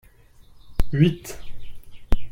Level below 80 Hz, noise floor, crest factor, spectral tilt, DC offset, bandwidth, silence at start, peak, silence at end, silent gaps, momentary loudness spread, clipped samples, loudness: -30 dBFS; -50 dBFS; 18 dB; -7 dB/octave; under 0.1%; 16 kHz; 0.65 s; -4 dBFS; 0 s; none; 20 LU; under 0.1%; -24 LUFS